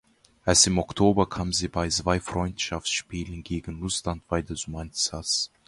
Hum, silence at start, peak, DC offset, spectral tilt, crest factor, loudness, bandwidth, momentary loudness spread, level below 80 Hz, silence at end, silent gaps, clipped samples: none; 0.45 s; -4 dBFS; under 0.1%; -3.5 dB/octave; 22 dB; -26 LUFS; 11.5 kHz; 13 LU; -42 dBFS; 0.2 s; none; under 0.1%